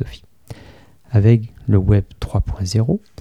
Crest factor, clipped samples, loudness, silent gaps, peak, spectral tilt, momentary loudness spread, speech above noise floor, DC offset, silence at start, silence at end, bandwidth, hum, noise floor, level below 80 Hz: 16 dB; under 0.1%; -18 LUFS; none; -2 dBFS; -8 dB/octave; 9 LU; 30 dB; 0.3%; 0 s; 0.25 s; 9.8 kHz; none; -46 dBFS; -32 dBFS